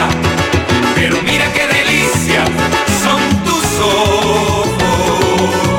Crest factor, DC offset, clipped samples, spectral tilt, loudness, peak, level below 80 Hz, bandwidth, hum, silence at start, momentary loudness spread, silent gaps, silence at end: 12 dB; under 0.1%; under 0.1%; -4 dB/octave; -12 LUFS; 0 dBFS; -30 dBFS; 17.5 kHz; none; 0 s; 2 LU; none; 0 s